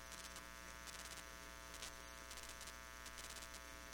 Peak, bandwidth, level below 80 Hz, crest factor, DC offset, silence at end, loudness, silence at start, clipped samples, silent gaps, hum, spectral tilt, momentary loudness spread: -30 dBFS; 19 kHz; -64 dBFS; 24 dB; under 0.1%; 0 s; -52 LUFS; 0 s; under 0.1%; none; 60 Hz at -65 dBFS; -1.5 dB/octave; 3 LU